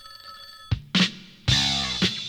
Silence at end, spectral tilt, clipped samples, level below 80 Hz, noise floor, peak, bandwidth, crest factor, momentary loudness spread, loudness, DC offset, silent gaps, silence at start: 0 s; -3.5 dB/octave; under 0.1%; -42 dBFS; -44 dBFS; -8 dBFS; 19.5 kHz; 18 dB; 21 LU; -23 LUFS; under 0.1%; none; 0.05 s